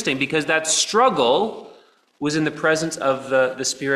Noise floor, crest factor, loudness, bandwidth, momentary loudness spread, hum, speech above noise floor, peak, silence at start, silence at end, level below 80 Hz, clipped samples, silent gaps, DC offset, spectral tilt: -51 dBFS; 16 dB; -20 LUFS; 13.5 kHz; 8 LU; none; 31 dB; -4 dBFS; 0 s; 0 s; -62 dBFS; under 0.1%; none; under 0.1%; -2.5 dB/octave